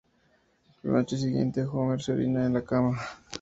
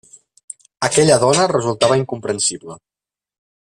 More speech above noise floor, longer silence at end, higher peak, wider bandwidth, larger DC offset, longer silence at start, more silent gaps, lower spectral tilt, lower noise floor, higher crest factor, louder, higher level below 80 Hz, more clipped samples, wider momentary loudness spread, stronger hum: second, 40 dB vs 73 dB; second, 0 s vs 0.85 s; second, -12 dBFS vs -2 dBFS; second, 8 kHz vs 14.5 kHz; neither; about the same, 0.85 s vs 0.8 s; neither; first, -7.5 dB/octave vs -3.5 dB/octave; second, -67 dBFS vs -89 dBFS; about the same, 18 dB vs 18 dB; second, -28 LUFS vs -16 LUFS; about the same, -58 dBFS vs -54 dBFS; neither; second, 6 LU vs 23 LU; neither